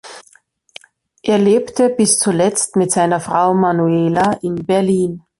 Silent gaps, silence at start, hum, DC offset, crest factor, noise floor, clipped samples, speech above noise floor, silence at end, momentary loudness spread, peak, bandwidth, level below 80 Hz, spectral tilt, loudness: none; 0.05 s; none; under 0.1%; 16 dB; -53 dBFS; under 0.1%; 38 dB; 0.2 s; 4 LU; 0 dBFS; 11.5 kHz; -54 dBFS; -5 dB/octave; -15 LUFS